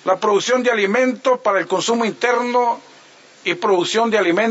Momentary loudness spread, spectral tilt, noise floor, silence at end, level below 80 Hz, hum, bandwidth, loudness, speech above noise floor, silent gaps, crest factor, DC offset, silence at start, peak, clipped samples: 5 LU; -3.5 dB/octave; -46 dBFS; 0 s; -74 dBFS; none; 8 kHz; -17 LUFS; 29 dB; none; 14 dB; under 0.1%; 0.05 s; -4 dBFS; under 0.1%